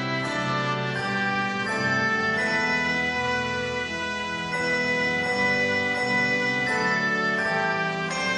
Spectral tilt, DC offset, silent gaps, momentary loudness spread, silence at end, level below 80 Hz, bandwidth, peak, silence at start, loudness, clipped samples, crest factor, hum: -4 dB/octave; under 0.1%; none; 5 LU; 0 s; -56 dBFS; 11.5 kHz; -12 dBFS; 0 s; -24 LUFS; under 0.1%; 12 dB; none